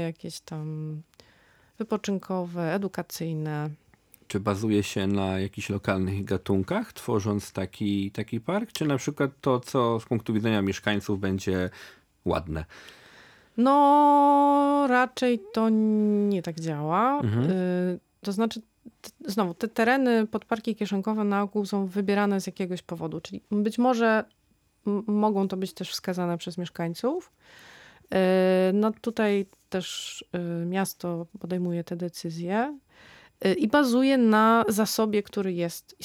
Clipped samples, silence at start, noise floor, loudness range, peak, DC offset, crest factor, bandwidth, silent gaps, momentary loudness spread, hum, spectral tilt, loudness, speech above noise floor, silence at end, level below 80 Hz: under 0.1%; 0 s; -63 dBFS; 8 LU; -8 dBFS; under 0.1%; 20 dB; 17.5 kHz; none; 13 LU; none; -6 dB/octave; -26 LUFS; 38 dB; 0 s; -62 dBFS